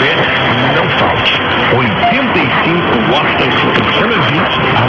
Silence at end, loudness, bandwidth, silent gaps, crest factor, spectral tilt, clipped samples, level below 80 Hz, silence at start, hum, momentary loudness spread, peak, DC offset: 0 s; -10 LUFS; 7.8 kHz; none; 12 dB; -6.5 dB/octave; under 0.1%; -38 dBFS; 0 s; none; 1 LU; 0 dBFS; under 0.1%